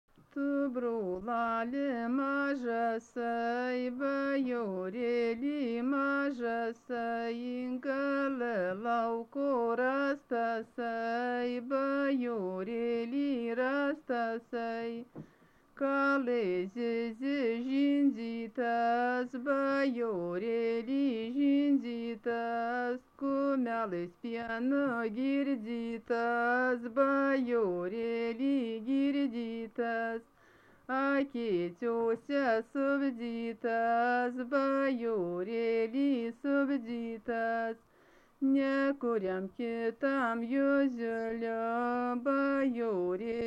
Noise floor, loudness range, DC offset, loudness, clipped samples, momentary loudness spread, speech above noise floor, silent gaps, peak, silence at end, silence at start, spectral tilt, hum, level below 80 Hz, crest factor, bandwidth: -63 dBFS; 3 LU; under 0.1%; -33 LUFS; under 0.1%; 7 LU; 31 dB; none; -18 dBFS; 0 s; 0.35 s; -7 dB/octave; none; -72 dBFS; 16 dB; 6.8 kHz